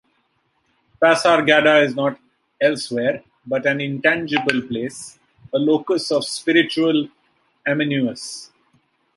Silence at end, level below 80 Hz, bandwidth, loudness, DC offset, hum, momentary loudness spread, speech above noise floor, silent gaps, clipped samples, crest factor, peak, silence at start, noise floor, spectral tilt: 0.7 s; -64 dBFS; 11.5 kHz; -19 LUFS; under 0.1%; none; 16 LU; 48 dB; none; under 0.1%; 20 dB; 0 dBFS; 1 s; -67 dBFS; -4.5 dB/octave